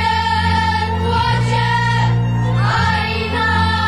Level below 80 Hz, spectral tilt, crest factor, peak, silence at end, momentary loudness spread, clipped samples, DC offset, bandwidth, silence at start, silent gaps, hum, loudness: -32 dBFS; -5.5 dB/octave; 10 dB; -6 dBFS; 0 s; 2 LU; under 0.1%; 1%; 10.5 kHz; 0 s; none; none; -16 LUFS